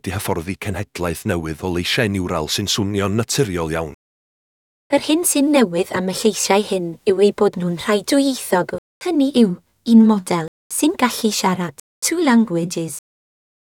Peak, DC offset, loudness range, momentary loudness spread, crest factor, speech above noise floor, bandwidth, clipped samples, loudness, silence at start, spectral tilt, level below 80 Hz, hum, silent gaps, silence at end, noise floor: 0 dBFS; under 0.1%; 4 LU; 10 LU; 18 dB; over 72 dB; 18.5 kHz; under 0.1%; -18 LUFS; 0.05 s; -4.5 dB/octave; -48 dBFS; none; 3.94-4.90 s, 8.78-9.01 s, 10.48-10.70 s, 11.80-12.02 s; 0.7 s; under -90 dBFS